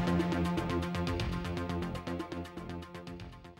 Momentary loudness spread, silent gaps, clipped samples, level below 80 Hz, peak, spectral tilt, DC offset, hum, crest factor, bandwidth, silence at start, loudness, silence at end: 14 LU; none; under 0.1%; -50 dBFS; -20 dBFS; -6.5 dB/octave; under 0.1%; none; 16 dB; 15.5 kHz; 0 s; -36 LUFS; 0.05 s